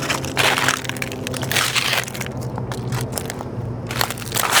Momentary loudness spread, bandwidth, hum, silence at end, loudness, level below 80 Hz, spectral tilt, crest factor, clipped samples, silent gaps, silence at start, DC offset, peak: 11 LU; over 20 kHz; none; 0 s; -21 LUFS; -44 dBFS; -2.5 dB/octave; 22 dB; under 0.1%; none; 0 s; under 0.1%; 0 dBFS